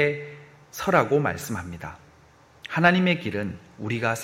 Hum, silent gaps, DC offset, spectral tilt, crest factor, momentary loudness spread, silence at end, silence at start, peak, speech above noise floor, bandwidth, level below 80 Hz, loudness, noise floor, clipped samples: none; none; under 0.1%; -5.5 dB/octave; 22 dB; 20 LU; 0 s; 0 s; -4 dBFS; 30 dB; 16 kHz; -56 dBFS; -24 LUFS; -54 dBFS; under 0.1%